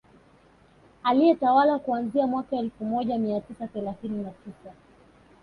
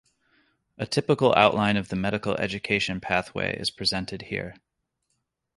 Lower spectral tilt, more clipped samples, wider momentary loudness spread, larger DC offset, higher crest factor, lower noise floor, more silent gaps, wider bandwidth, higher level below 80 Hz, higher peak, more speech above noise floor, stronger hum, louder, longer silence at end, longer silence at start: first, -8 dB/octave vs -5 dB/octave; neither; about the same, 15 LU vs 13 LU; neither; second, 18 dB vs 24 dB; second, -57 dBFS vs -77 dBFS; neither; second, 9.6 kHz vs 11.5 kHz; second, -62 dBFS vs -54 dBFS; second, -8 dBFS vs -2 dBFS; second, 32 dB vs 52 dB; neither; about the same, -25 LUFS vs -25 LUFS; second, 0.7 s vs 1.05 s; first, 1.05 s vs 0.8 s